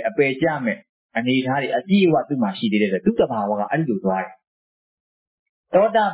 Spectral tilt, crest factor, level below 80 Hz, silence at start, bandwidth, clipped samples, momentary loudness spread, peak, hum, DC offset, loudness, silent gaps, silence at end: -10.5 dB/octave; 16 dB; -60 dBFS; 0 s; 4 kHz; under 0.1%; 9 LU; -6 dBFS; none; under 0.1%; -20 LUFS; 0.89-1.09 s, 4.47-5.64 s; 0 s